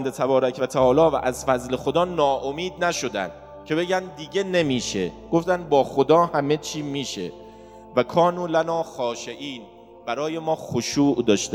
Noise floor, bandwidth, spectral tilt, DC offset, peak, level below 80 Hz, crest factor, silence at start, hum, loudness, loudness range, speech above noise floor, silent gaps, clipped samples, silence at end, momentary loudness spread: -44 dBFS; 16.5 kHz; -5 dB/octave; under 0.1%; -4 dBFS; -52 dBFS; 20 dB; 0 s; none; -23 LUFS; 3 LU; 21 dB; none; under 0.1%; 0 s; 12 LU